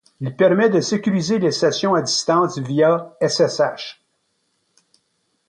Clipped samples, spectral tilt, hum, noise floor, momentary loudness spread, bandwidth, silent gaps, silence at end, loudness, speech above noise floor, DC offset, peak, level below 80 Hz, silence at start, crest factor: under 0.1%; -4.5 dB/octave; none; -69 dBFS; 5 LU; 10.5 kHz; none; 1.55 s; -18 LUFS; 51 dB; under 0.1%; -4 dBFS; -64 dBFS; 0.2 s; 16 dB